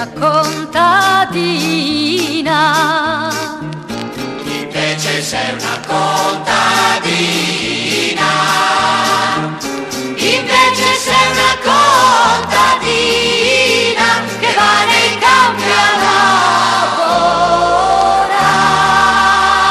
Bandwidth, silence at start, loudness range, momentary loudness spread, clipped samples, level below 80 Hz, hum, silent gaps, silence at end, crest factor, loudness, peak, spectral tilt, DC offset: 15 kHz; 0 s; 6 LU; 9 LU; under 0.1%; -42 dBFS; none; none; 0 s; 12 dB; -11 LUFS; 0 dBFS; -2.5 dB/octave; under 0.1%